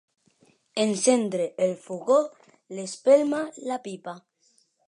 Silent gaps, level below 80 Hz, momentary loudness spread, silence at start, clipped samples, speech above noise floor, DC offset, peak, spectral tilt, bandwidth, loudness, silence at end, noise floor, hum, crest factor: none; -82 dBFS; 17 LU; 0.75 s; under 0.1%; 42 dB; under 0.1%; -8 dBFS; -4 dB/octave; 11 kHz; -25 LUFS; 0.7 s; -66 dBFS; none; 18 dB